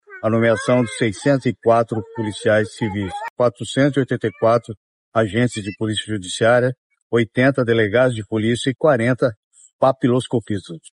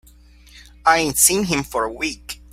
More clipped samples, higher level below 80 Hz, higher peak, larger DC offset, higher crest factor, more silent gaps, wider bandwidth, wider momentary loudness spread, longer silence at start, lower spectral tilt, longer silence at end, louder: neither; second, -56 dBFS vs -44 dBFS; second, -4 dBFS vs 0 dBFS; neither; about the same, 16 dB vs 20 dB; first, 3.30-3.37 s, 4.77-5.12 s, 6.78-6.90 s, 7.02-7.10 s, 9.37-9.51 s, 9.73-9.79 s vs none; second, 11 kHz vs 16.5 kHz; second, 8 LU vs 12 LU; second, 0.1 s vs 0.55 s; first, -6 dB/octave vs -2 dB/octave; about the same, 0.2 s vs 0.2 s; about the same, -19 LUFS vs -18 LUFS